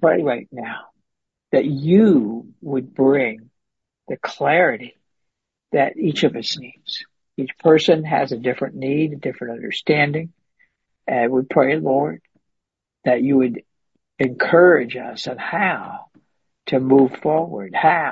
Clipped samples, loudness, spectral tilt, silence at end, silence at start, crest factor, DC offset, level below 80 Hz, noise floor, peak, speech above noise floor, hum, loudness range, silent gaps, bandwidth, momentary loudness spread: under 0.1%; -19 LUFS; -6.5 dB/octave; 0 s; 0 s; 18 dB; under 0.1%; -64 dBFS; -81 dBFS; 0 dBFS; 62 dB; none; 3 LU; none; 7.8 kHz; 16 LU